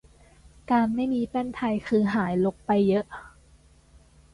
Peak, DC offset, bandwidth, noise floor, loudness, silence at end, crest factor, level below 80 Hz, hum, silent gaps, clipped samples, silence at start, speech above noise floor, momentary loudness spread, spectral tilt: -10 dBFS; under 0.1%; 11 kHz; -56 dBFS; -25 LUFS; 1.05 s; 16 dB; -54 dBFS; none; none; under 0.1%; 0.7 s; 32 dB; 6 LU; -8 dB/octave